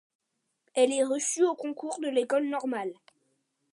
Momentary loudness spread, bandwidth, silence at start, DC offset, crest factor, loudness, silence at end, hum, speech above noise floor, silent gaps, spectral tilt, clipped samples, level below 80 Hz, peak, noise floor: 10 LU; 11.5 kHz; 0.75 s; under 0.1%; 20 dB; -28 LUFS; 0.8 s; none; 48 dB; none; -2 dB/octave; under 0.1%; -86 dBFS; -10 dBFS; -76 dBFS